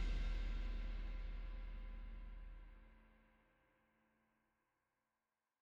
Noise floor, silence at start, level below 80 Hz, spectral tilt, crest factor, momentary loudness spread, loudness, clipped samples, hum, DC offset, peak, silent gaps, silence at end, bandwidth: under -90 dBFS; 0 s; -48 dBFS; -6 dB/octave; 14 dB; 17 LU; -51 LUFS; under 0.1%; none; under 0.1%; -34 dBFS; none; 2.5 s; 6.8 kHz